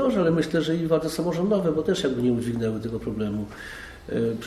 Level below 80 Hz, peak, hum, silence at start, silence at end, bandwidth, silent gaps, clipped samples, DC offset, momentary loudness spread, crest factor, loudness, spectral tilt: -48 dBFS; -10 dBFS; none; 0 s; 0 s; 14 kHz; none; under 0.1%; under 0.1%; 10 LU; 14 dB; -25 LUFS; -6.5 dB/octave